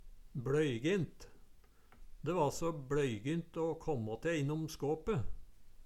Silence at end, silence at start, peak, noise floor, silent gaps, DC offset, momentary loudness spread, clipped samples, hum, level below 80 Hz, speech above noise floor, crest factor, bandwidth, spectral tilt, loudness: 0 s; 0 s; -20 dBFS; -60 dBFS; none; under 0.1%; 8 LU; under 0.1%; none; -54 dBFS; 24 dB; 16 dB; 15 kHz; -6.5 dB/octave; -37 LUFS